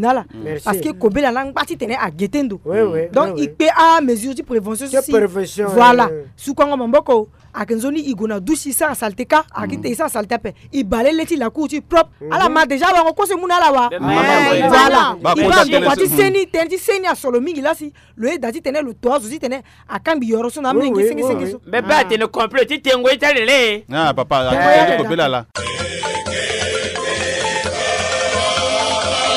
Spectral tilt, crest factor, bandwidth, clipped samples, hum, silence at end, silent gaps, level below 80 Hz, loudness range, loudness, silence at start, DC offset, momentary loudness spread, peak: -3.5 dB/octave; 16 dB; 16 kHz; under 0.1%; none; 0 s; none; -44 dBFS; 6 LU; -16 LUFS; 0 s; under 0.1%; 11 LU; 0 dBFS